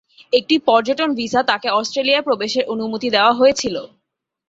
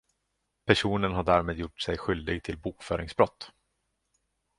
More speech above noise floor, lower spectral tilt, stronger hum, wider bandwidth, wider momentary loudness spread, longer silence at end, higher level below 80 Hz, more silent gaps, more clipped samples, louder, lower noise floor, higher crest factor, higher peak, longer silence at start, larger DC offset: first, 58 dB vs 51 dB; second, -3 dB/octave vs -5.5 dB/octave; neither; second, 8 kHz vs 11.5 kHz; second, 8 LU vs 12 LU; second, 0.65 s vs 1.1 s; second, -58 dBFS vs -48 dBFS; neither; neither; first, -17 LUFS vs -28 LUFS; second, -75 dBFS vs -79 dBFS; second, 16 dB vs 26 dB; about the same, -2 dBFS vs -4 dBFS; second, 0.3 s vs 0.65 s; neither